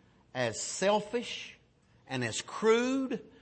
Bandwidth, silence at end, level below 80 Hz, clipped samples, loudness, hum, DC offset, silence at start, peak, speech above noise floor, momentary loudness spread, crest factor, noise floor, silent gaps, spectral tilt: 8.8 kHz; 0.1 s; -70 dBFS; under 0.1%; -32 LUFS; none; under 0.1%; 0.35 s; -14 dBFS; 33 dB; 13 LU; 18 dB; -65 dBFS; none; -3.5 dB/octave